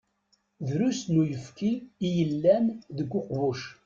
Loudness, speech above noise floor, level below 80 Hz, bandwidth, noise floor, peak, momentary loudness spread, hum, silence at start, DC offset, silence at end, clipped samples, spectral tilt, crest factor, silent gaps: -28 LUFS; 44 dB; -64 dBFS; 7.6 kHz; -71 dBFS; -10 dBFS; 9 LU; none; 0.6 s; under 0.1%; 0.15 s; under 0.1%; -7 dB/octave; 18 dB; none